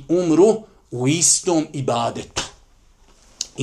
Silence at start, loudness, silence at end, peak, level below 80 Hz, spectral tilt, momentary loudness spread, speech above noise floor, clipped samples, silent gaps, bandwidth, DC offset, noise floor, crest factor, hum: 0 s; -18 LUFS; 0 s; 0 dBFS; -52 dBFS; -4 dB/octave; 16 LU; 34 dB; under 0.1%; none; 14 kHz; under 0.1%; -52 dBFS; 20 dB; none